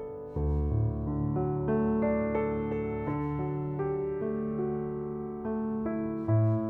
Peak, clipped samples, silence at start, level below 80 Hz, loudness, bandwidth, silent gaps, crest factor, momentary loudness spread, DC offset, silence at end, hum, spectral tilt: -18 dBFS; under 0.1%; 0 s; -42 dBFS; -31 LUFS; 3.3 kHz; none; 12 dB; 6 LU; under 0.1%; 0 s; none; -12.5 dB/octave